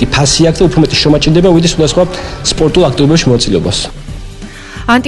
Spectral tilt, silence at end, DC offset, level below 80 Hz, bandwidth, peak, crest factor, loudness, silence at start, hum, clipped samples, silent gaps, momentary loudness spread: -5 dB/octave; 0 s; under 0.1%; -24 dBFS; 12 kHz; 0 dBFS; 10 dB; -9 LUFS; 0 s; none; 0.3%; none; 19 LU